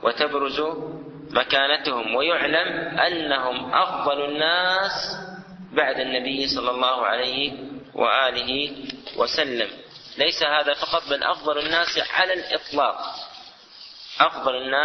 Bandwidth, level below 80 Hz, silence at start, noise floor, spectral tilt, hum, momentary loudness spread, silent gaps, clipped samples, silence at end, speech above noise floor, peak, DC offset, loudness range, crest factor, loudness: 6.4 kHz; -58 dBFS; 0 s; -45 dBFS; -3 dB/octave; none; 15 LU; none; under 0.1%; 0 s; 22 dB; -2 dBFS; under 0.1%; 2 LU; 22 dB; -22 LUFS